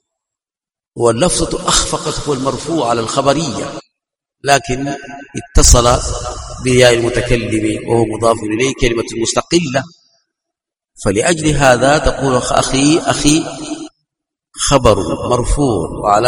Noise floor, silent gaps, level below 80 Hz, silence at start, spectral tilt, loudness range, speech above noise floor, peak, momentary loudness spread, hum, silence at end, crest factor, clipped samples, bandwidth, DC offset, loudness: under -90 dBFS; none; -24 dBFS; 0.95 s; -4 dB/octave; 4 LU; over 77 dB; 0 dBFS; 13 LU; none; 0 s; 14 dB; 0.3%; over 20 kHz; under 0.1%; -14 LUFS